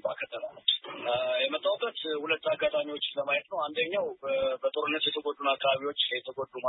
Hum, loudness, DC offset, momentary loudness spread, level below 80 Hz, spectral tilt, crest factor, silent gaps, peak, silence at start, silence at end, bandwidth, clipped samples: none; -30 LUFS; under 0.1%; 5 LU; -72 dBFS; -6.5 dB/octave; 20 dB; none; -10 dBFS; 0.05 s; 0 s; 4.1 kHz; under 0.1%